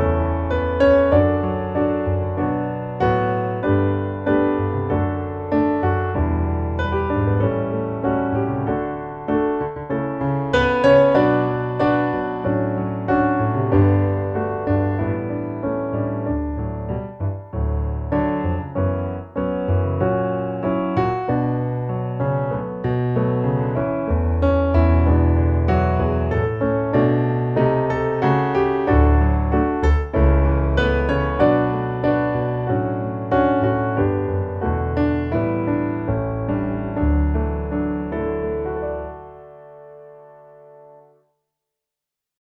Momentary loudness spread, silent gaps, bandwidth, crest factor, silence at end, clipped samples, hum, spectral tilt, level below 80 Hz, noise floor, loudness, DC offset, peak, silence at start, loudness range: 8 LU; none; 5.8 kHz; 16 dB; 2.1 s; under 0.1%; none; -9.5 dB/octave; -28 dBFS; -85 dBFS; -20 LUFS; under 0.1%; -2 dBFS; 0 s; 6 LU